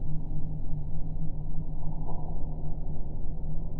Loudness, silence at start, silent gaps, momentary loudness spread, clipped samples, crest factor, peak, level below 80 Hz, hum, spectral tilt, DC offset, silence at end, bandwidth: -38 LUFS; 0 s; none; 2 LU; under 0.1%; 10 dB; -14 dBFS; -30 dBFS; none; -13 dB/octave; under 0.1%; 0 s; 1.1 kHz